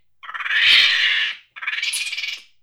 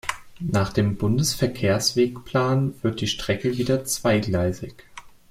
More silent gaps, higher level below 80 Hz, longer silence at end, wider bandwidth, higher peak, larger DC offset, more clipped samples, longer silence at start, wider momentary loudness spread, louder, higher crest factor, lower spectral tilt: neither; second, -64 dBFS vs -48 dBFS; about the same, 0.2 s vs 0.25 s; first, over 20 kHz vs 16.5 kHz; first, -2 dBFS vs -6 dBFS; first, 0.1% vs under 0.1%; neither; first, 0.25 s vs 0.05 s; first, 17 LU vs 5 LU; first, -16 LUFS vs -23 LUFS; about the same, 18 dB vs 16 dB; second, 3.5 dB/octave vs -5 dB/octave